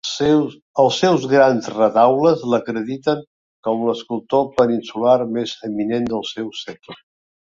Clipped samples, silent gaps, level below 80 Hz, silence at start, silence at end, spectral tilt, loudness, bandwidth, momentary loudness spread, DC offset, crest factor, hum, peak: under 0.1%; 0.62-0.74 s, 3.27-3.63 s; -58 dBFS; 0.05 s; 0.65 s; -5.5 dB/octave; -18 LUFS; 7.8 kHz; 12 LU; under 0.1%; 16 dB; none; -2 dBFS